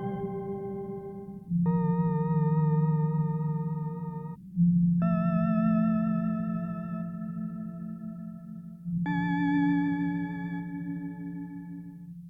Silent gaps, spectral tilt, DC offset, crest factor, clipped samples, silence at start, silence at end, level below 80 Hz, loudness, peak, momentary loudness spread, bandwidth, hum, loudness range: none; -11 dB/octave; under 0.1%; 12 dB; under 0.1%; 0 s; 0 s; -58 dBFS; -29 LUFS; -16 dBFS; 15 LU; 3.7 kHz; none; 5 LU